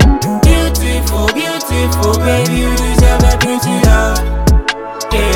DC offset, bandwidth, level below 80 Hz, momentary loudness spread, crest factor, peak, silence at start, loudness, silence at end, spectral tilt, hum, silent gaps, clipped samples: under 0.1%; 18 kHz; -14 dBFS; 5 LU; 10 dB; 0 dBFS; 0 s; -12 LUFS; 0 s; -5 dB/octave; none; none; under 0.1%